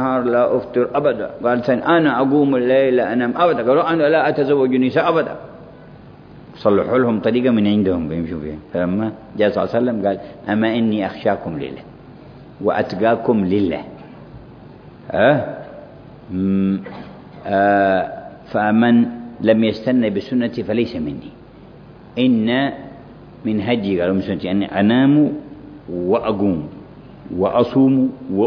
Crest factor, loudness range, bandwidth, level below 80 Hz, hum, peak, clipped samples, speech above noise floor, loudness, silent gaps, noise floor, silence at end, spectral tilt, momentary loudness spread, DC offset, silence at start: 16 dB; 5 LU; 5.4 kHz; -50 dBFS; none; -2 dBFS; under 0.1%; 24 dB; -18 LUFS; none; -41 dBFS; 0 s; -9 dB/octave; 16 LU; under 0.1%; 0 s